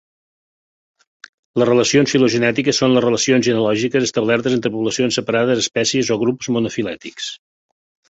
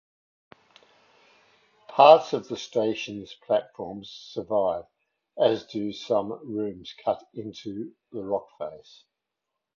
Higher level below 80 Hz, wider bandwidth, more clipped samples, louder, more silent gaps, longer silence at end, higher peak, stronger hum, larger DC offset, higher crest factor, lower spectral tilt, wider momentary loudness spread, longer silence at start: first, -56 dBFS vs -68 dBFS; first, 8 kHz vs 7.2 kHz; neither; first, -17 LUFS vs -25 LUFS; neither; second, 0.75 s vs 1 s; about the same, -2 dBFS vs -2 dBFS; neither; neither; second, 16 dB vs 26 dB; second, -4 dB/octave vs -5.5 dB/octave; second, 11 LU vs 20 LU; second, 1.55 s vs 1.9 s